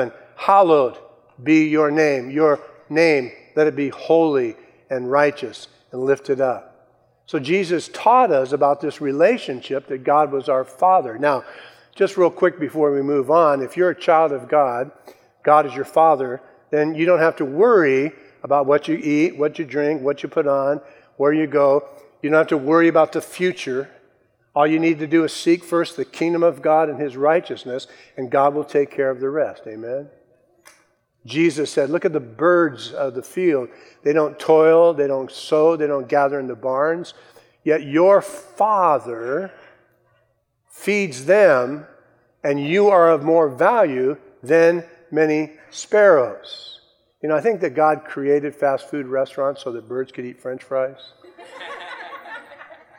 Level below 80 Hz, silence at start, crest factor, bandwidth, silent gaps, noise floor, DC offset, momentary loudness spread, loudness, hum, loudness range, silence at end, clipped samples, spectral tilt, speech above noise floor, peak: -76 dBFS; 0 s; 18 dB; 13.5 kHz; none; -66 dBFS; under 0.1%; 14 LU; -19 LUFS; none; 5 LU; 0.35 s; under 0.1%; -6 dB/octave; 48 dB; 0 dBFS